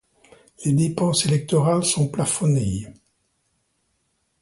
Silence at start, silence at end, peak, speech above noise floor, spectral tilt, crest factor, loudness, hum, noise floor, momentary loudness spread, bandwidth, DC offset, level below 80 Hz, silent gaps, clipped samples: 0.6 s; 1.5 s; -8 dBFS; 50 dB; -5 dB/octave; 16 dB; -21 LUFS; none; -70 dBFS; 9 LU; 11.5 kHz; under 0.1%; -50 dBFS; none; under 0.1%